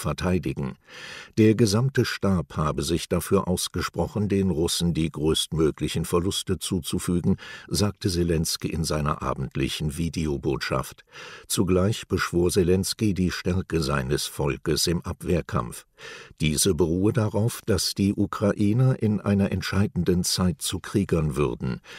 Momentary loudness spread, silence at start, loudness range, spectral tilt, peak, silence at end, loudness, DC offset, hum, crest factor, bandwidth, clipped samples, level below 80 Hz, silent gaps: 8 LU; 0 s; 3 LU; -5 dB/octave; -6 dBFS; 0 s; -25 LUFS; under 0.1%; none; 18 dB; 16 kHz; under 0.1%; -42 dBFS; none